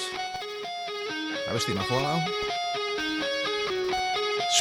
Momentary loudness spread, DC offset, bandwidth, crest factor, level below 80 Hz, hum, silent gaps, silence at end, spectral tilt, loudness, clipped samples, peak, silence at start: 7 LU; under 0.1%; 20 kHz; 20 dB; -58 dBFS; none; none; 0 s; -3 dB/octave; -28 LUFS; under 0.1%; -8 dBFS; 0 s